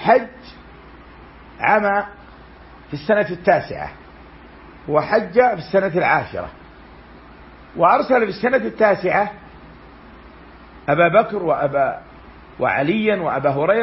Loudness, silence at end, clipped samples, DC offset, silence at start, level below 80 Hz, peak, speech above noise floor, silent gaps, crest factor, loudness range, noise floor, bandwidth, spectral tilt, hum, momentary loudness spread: -18 LUFS; 0 s; under 0.1%; under 0.1%; 0 s; -48 dBFS; -2 dBFS; 25 dB; none; 18 dB; 3 LU; -42 dBFS; 5.8 kHz; -10.5 dB/octave; none; 15 LU